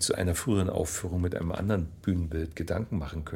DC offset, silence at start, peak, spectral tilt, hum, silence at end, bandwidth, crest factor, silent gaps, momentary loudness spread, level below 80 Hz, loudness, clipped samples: under 0.1%; 0 s; -12 dBFS; -5 dB/octave; none; 0 s; 16.5 kHz; 16 dB; none; 6 LU; -42 dBFS; -30 LUFS; under 0.1%